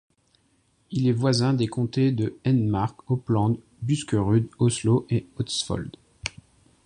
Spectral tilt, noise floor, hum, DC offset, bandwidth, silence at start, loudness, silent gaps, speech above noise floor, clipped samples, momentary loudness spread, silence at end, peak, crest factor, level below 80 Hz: -6.5 dB/octave; -66 dBFS; none; under 0.1%; 11 kHz; 0.9 s; -25 LUFS; none; 42 dB; under 0.1%; 10 LU; 0.55 s; -8 dBFS; 18 dB; -50 dBFS